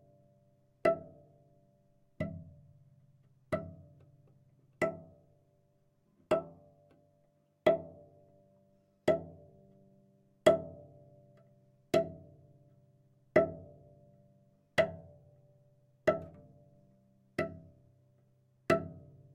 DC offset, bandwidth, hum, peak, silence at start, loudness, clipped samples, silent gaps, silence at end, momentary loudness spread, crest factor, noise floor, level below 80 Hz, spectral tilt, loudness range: under 0.1%; 11.5 kHz; none; -12 dBFS; 0.85 s; -34 LUFS; under 0.1%; none; 0.35 s; 23 LU; 26 dB; -72 dBFS; -70 dBFS; -6 dB/octave; 8 LU